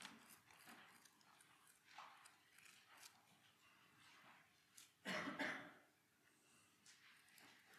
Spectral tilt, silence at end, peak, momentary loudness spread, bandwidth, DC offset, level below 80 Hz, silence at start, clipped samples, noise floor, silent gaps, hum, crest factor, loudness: -3 dB/octave; 0 s; -34 dBFS; 21 LU; 14.5 kHz; under 0.1%; under -90 dBFS; 0 s; under 0.1%; -78 dBFS; none; none; 26 dB; -54 LUFS